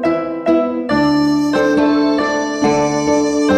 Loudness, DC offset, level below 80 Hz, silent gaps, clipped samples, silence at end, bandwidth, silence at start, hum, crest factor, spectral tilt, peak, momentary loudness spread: -15 LUFS; under 0.1%; -44 dBFS; none; under 0.1%; 0 s; 9.4 kHz; 0 s; none; 12 dB; -5 dB/octave; -2 dBFS; 3 LU